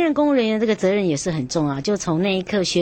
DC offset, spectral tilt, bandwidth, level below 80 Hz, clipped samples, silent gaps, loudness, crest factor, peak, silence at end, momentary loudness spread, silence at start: under 0.1%; -5 dB/octave; 9 kHz; -50 dBFS; under 0.1%; none; -20 LUFS; 12 dB; -8 dBFS; 0 s; 5 LU; 0 s